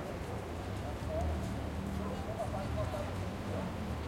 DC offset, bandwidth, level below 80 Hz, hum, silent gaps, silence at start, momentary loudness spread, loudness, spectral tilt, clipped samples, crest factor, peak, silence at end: under 0.1%; 16.5 kHz; -46 dBFS; none; none; 0 s; 4 LU; -39 LUFS; -6.5 dB/octave; under 0.1%; 14 dB; -24 dBFS; 0 s